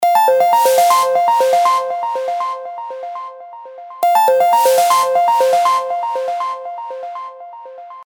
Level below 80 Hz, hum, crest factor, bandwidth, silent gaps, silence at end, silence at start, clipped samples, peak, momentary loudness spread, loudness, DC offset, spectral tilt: -82 dBFS; none; 14 dB; over 20 kHz; none; 0 s; 0 s; under 0.1%; -2 dBFS; 21 LU; -14 LUFS; under 0.1%; -0.5 dB/octave